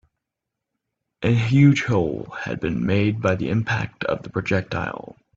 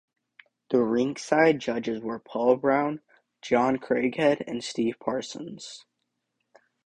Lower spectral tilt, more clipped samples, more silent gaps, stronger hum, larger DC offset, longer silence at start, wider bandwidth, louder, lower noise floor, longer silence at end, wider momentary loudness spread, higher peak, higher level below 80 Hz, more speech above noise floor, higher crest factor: first, -7.5 dB/octave vs -5 dB/octave; neither; neither; neither; neither; first, 1.2 s vs 0.7 s; second, 7.6 kHz vs 10 kHz; first, -22 LUFS vs -26 LUFS; about the same, -83 dBFS vs -80 dBFS; second, 0.4 s vs 1.05 s; second, 12 LU vs 17 LU; about the same, -4 dBFS vs -6 dBFS; first, -50 dBFS vs -66 dBFS; first, 63 dB vs 54 dB; about the same, 18 dB vs 20 dB